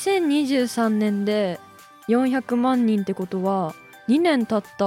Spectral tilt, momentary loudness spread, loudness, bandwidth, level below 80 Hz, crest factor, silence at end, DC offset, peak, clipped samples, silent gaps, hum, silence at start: -6 dB/octave; 8 LU; -22 LUFS; 16 kHz; -70 dBFS; 14 dB; 0 s; under 0.1%; -8 dBFS; under 0.1%; none; none; 0 s